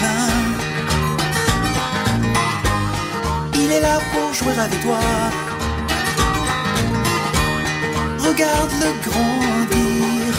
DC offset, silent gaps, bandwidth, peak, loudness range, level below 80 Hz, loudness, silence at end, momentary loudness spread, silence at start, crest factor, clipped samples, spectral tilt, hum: under 0.1%; none; 16 kHz; -2 dBFS; 1 LU; -32 dBFS; -19 LUFS; 0 s; 4 LU; 0 s; 18 dB; under 0.1%; -4 dB/octave; none